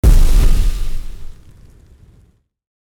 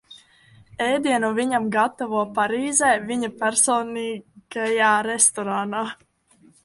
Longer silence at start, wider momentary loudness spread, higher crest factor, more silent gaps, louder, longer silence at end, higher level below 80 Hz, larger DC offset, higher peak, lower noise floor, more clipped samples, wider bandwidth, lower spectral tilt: about the same, 0.05 s vs 0.1 s; first, 24 LU vs 11 LU; second, 12 dB vs 20 dB; neither; first, -18 LUFS vs -21 LUFS; first, 1.55 s vs 0.7 s; first, -14 dBFS vs -64 dBFS; neither; about the same, -2 dBFS vs -2 dBFS; second, -52 dBFS vs -57 dBFS; neither; first, 15.5 kHz vs 12 kHz; first, -6 dB/octave vs -2 dB/octave